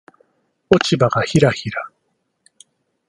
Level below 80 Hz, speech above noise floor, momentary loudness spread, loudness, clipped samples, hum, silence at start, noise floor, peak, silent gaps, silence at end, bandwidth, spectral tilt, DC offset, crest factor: -50 dBFS; 54 dB; 13 LU; -17 LUFS; under 0.1%; none; 0.7 s; -70 dBFS; 0 dBFS; none; 1.2 s; 11.5 kHz; -5.5 dB/octave; under 0.1%; 20 dB